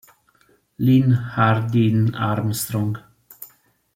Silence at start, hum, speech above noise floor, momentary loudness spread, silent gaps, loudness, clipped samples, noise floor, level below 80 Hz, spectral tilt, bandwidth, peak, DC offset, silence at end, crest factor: 0.8 s; none; 41 dB; 23 LU; none; -20 LUFS; under 0.1%; -60 dBFS; -54 dBFS; -6.5 dB/octave; 16.5 kHz; -4 dBFS; under 0.1%; 0.5 s; 18 dB